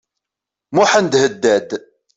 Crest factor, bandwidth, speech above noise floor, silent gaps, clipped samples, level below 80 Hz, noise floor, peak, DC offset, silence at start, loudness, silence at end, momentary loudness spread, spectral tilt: 16 dB; 8 kHz; 70 dB; none; under 0.1%; -60 dBFS; -84 dBFS; -2 dBFS; under 0.1%; 0.7 s; -15 LUFS; 0.4 s; 13 LU; -3.5 dB/octave